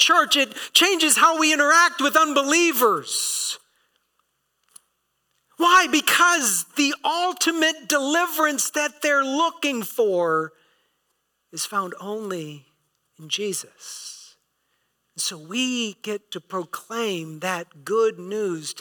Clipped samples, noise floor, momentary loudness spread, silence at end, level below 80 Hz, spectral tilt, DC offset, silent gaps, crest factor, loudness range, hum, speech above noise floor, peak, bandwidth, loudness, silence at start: under 0.1%; -73 dBFS; 16 LU; 0 s; -74 dBFS; -1.5 dB/octave; under 0.1%; none; 18 dB; 13 LU; none; 51 dB; -4 dBFS; 19 kHz; -20 LUFS; 0 s